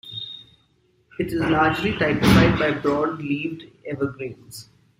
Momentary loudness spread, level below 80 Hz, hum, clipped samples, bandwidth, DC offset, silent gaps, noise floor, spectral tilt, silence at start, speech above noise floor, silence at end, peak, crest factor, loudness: 23 LU; -42 dBFS; none; under 0.1%; 16 kHz; under 0.1%; none; -63 dBFS; -6 dB/octave; 0.05 s; 42 dB; 0.35 s; -2 dBFS; 20 dB; -21 LUFS